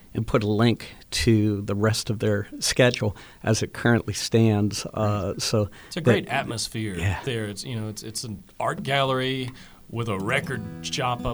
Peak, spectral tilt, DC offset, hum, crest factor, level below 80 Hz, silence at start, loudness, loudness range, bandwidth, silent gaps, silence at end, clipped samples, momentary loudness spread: -6 dBFS; -5 dB/octave; under 0.1%; none; 18 dB; -46 dBFS; 0.15 s; -25 LUFS; 4 LU; over 20 kHz; none; 0 s; under 0.1%; 11 LU